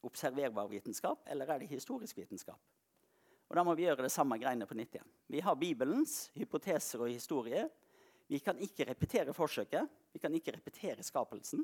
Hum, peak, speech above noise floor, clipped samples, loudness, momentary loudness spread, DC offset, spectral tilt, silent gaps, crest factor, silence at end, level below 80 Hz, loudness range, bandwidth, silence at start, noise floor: none; -18 dBFS; 36 dB; under 0.1%; -38 LUFS; 11 LU; under 0.1%; -4.5 dB/octave; none; 20 dB; 0 s; -72 dBFS; 4 LU; 19 kHz; 0.05 s; -74 dBFS